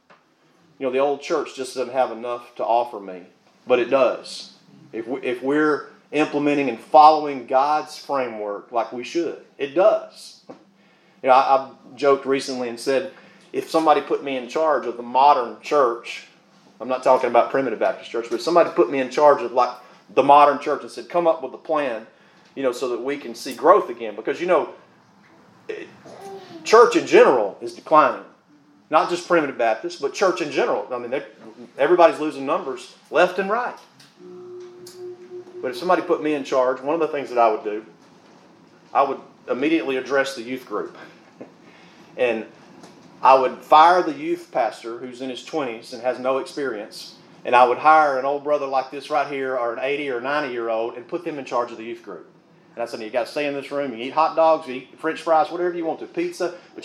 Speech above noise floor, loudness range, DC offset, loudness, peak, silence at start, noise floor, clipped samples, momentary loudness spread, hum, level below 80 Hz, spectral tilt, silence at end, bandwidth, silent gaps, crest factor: 38 dB; 7 LU; under 0.1%; -21 LUFS; 0 dBFS; 0.8 s; -58 dBFS; under 0.1%; 19 LU; none; -86 dBFS; -4.5 dB/octave; 0 s; 13.5 kHz; none; 20 dB